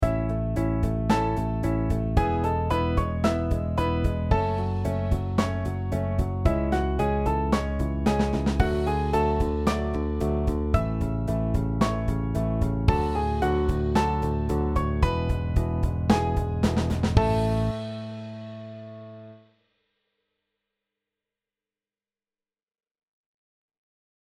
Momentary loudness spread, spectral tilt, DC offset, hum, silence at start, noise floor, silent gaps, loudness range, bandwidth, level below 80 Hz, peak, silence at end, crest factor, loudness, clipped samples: 4 LU; -7.5 dB/octave; under 0.1%; none; 0 s; under -90 dBFS; none; 3 LU; 13.5 kHz; -32 dBFS; -6 dBFS; 4.95 s; 20 dB; -26 LUFS; under 0.1%